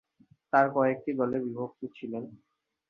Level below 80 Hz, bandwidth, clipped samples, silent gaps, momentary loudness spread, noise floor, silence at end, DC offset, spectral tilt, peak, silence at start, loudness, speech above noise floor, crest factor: -72 dBFS; 6.6 kHz; under 0.1%; none; 15 LU; -64 dBFS; 0.55 s; under 0.1%; -9 dB/octave; -8 dBFS; 0.55 s; -29 LUFS; 35 dB; 22 dB